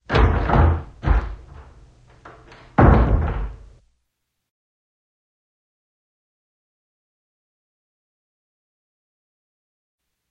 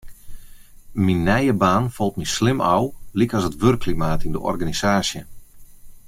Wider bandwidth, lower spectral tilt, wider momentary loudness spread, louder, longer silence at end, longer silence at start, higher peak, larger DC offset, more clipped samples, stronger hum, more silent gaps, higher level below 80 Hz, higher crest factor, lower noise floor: second, 6.4 kHz vs 16 kHz; first, -9 dB/octave vs -5.5 dB/octave; first, 19 LU vs 7 LU; about the same, -19 LUFS vs -21 LUFS; first, 6.75 s vs 0.1 s; about the same, 0.1 s vs 0.05 s; first, 0 dBFS vs -4 dBFS; neither; neither; neither; neither; first, -26 dBFS vs -38 dBFS; first, 24 dB vs 18 dB; first, -76 dBFS vs -41 dBFS